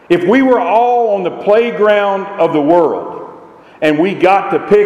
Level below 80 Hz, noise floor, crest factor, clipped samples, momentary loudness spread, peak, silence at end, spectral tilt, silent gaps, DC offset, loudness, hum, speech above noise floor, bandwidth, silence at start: -54 dBFS; -37 dBFS; 12 dB; under 0.1%; 6 LU; 0 dBFS; 0 s; -7 dB/octave; none; under 0.1%; -12 LUFS; none; 26 dB; 10.5 kHz; 0.1 s